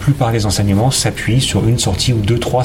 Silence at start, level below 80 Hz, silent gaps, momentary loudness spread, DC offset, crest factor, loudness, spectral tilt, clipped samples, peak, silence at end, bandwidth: 0 s; -30 dBFS; none; 2 LU; under 0.1%; 12 dB; -14 LUFS; -5 dB/octave; under 0.1%; -2 dBFS; 0 s; 16.5 kHz